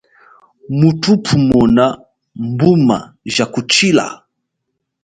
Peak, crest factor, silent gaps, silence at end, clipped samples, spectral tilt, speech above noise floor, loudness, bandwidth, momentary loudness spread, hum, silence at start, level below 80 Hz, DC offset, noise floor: 0 dBFS; 14 dB; none; 0.9 s; under 0.1%; -5.5 dB/octave; 61 dB; -13 LUFS; 9.4 kHz; 12 LU; none; 0.7 s; -44 dBFS; under 0.1%; -74 dBFS